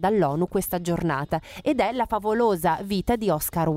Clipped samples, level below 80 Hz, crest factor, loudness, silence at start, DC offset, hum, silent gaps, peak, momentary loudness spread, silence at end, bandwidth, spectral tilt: under 0.1%; -46 dBFS; 16 dB; -24 LUFS; 0 s; under 0.1%; none; none; -8 dBFS; 4 LU; 0 s; 16 kHz; -6 dB/octave